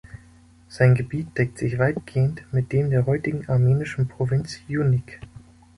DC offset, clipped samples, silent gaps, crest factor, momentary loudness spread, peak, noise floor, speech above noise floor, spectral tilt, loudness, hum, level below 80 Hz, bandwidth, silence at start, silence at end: under 0.1%; under 0.1%; none; 18 dB; 8 LU; -4 dBFS; -51 dBFS; 30 dB; -8 dB/octave; -23 LUFS; none; -48 dBFS; 11 kHz; 0.15 s; 0.4 s